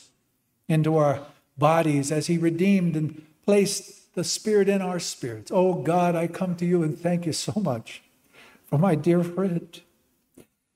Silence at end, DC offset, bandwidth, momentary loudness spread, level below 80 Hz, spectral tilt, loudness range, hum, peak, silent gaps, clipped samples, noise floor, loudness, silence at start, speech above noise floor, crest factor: 0.95 s; under 0.1%; 15.5 kHz; 10 LU; -66 dBFS; -6 dB/octave; 3 LU; none; -6 dBFS; none; under 0.1%; -71 dBFS; -24 LUFS; 0.7 s; 48 dB; 18 dB